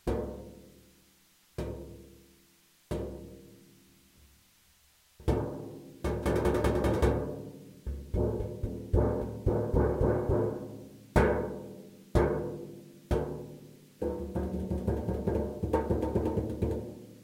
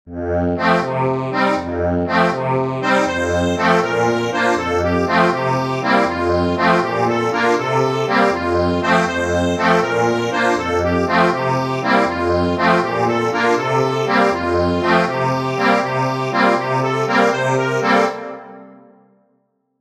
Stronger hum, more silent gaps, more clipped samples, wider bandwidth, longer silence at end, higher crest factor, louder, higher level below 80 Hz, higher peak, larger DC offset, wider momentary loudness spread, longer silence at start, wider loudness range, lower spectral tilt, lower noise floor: neither; neither; neither; first, 16 kHz vs 14 kHz; second, 0 s vs 1.1 s; first, 22 dB vs 16 dB; second, -32 LUFS vs -17 LUFS; about the same, -40 dBFS vs -44 dBFS; second, -10 dBFS vs -2 dBFS; neither; first, 19 LU vs 4 LU; about the same, 0.05 s vs 0.05 s; first, 14 LU vs 1 LU; first, -8 dB/octave vs -6 dB/octave; about the same, -64 dBFS vs -65 dBFS